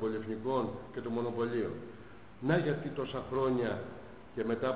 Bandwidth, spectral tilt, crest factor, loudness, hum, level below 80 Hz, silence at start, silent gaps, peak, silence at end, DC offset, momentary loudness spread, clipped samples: 4 kHz; -6 dB/octave; 18 dB; -35 LUFS; none; -62 dBFS; 0 s; none; -18 dBFS; 0 s; 0.2%; 15 LU; under 0.1%